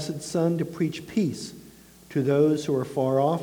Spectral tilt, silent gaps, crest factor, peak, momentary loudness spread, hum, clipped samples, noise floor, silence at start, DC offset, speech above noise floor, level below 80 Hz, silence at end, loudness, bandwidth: -6.5 dB/octave; none; 16 dB; -10 dBFS; 8 LU; none; under 0.1%; -50 dBFS; 0 s; under 0.1%; 25 dB; -62 dBFS; 0 s; -25 LUFS; 20 kHz